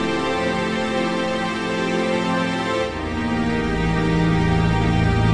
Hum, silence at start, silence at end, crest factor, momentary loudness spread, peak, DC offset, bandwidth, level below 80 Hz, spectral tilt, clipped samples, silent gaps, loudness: none; 0 s; 0 s; 14 dB; 4 LU; -6 dBFS; under 0.1%; 11 kHz; -34 dBFS; -6.5 dB/octave; under 0.1%; none; -21 LUFS